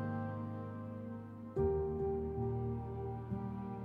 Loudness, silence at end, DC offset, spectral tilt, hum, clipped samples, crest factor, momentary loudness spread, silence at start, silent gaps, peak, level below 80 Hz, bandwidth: -40 LUFS; 0 s; under 0.1%; -11 dB/octave; none; under 0.1%; 16 dB; 10 LU; 0 s; none; -24 dBFS; -52 dBFS; 4.2 kHz